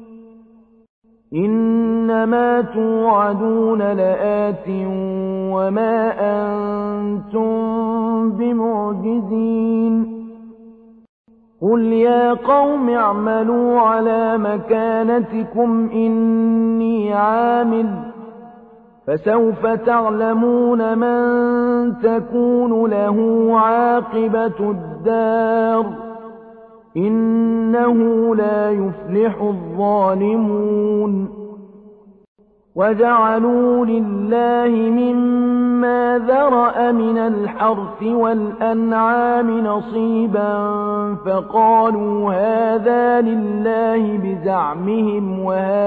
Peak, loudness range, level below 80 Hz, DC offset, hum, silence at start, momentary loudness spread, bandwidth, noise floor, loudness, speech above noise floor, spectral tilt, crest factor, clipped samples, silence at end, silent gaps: -4 dBFS; 4 LU; -54 dBFS; under 0.1%; none; 0 s; 7 LU; 4.3 kHz; -49 dBFS; -17 LUFS; 33 dB; -10.5 dB/octave; 12 dB; under 0.1%; 0 s; 0.89-1.02 s, 11.09-11.24 s, 32.28-32.35 s